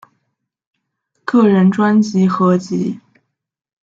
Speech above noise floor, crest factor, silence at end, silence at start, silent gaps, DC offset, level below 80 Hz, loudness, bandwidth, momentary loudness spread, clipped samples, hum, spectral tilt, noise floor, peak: 60 dB; 14 dB; 0.85 s; 1.3 s; none; under 0.1%; -62 dBFS; -14 LUFS; 7.6 kHz; 12 LU; under 0.1%; none; -8 dB/octave; -73 dBFS; -2 dBFS